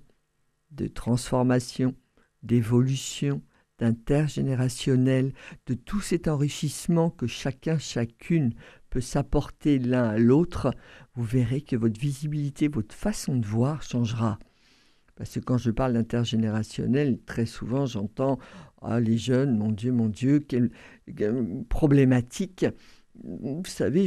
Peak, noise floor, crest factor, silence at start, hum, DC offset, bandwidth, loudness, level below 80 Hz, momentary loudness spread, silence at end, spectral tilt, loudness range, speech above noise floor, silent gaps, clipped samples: -8 dBFS; -71 dBFS; 18 dB; 0.7 s; none; under 0.1%; 14 kHz; -26 LUFS; -44 dBFS; 11 LU; 0 s; -7 dB/octave; 3 LU; 46 dB; none; under 0.1%